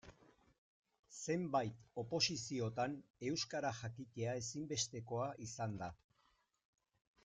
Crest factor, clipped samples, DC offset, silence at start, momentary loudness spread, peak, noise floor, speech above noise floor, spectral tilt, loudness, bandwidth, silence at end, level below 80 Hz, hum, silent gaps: 22 dB; under 0.1%; under 0.1%; 0.05 s; 11 LU; -22 dBFS; -79 dBFS; 37 dB; -4 dB/octave; -42 LUFS; 9.6 kHz; 1.3 s; -74 dBFS; none; 0.58-0.83 s, 0.99-1.03 s, 3.10-3.14 s